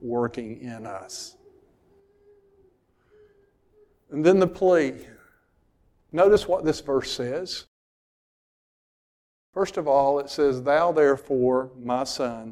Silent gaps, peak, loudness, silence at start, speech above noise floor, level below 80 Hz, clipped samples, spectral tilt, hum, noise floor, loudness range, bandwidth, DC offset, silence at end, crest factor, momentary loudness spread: 7.68-9.53 s; -6 dBFS; -23 LUFS; 0 s; 42 dB; -56 dBFS; under 0.1%; -5.5 dB/octave; none; -65 dBFS; 15 LU; 13.5 kHz; under 0.1%; 0 s; 20 dB; 17 LU